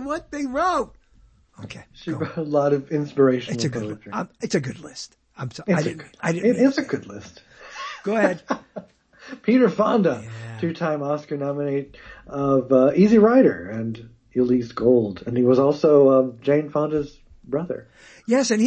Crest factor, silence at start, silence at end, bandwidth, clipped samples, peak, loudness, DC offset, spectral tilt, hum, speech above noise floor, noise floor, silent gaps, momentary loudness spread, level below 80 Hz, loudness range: 18 dB; 0 s; 0 s; 8.6 kHz; under 0.1%; -2 dBFS; -21 LUFS; under 0.1%; -6.5 dB/octave; none; 34 dB; -55 dBFS; none; 19 LU; -56 dBFS; 6 LU